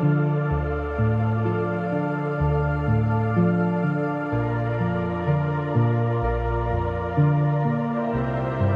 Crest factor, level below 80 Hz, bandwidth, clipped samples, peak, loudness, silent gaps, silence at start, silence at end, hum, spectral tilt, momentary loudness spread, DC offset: 14 dB; -36 dBFS; 5.2 kHz; under 0.1%; -8 dBFS; -23 LUFS; none; 0 s; 0 s; none; -10.5 dB/octave; 4 LU; under 0.1%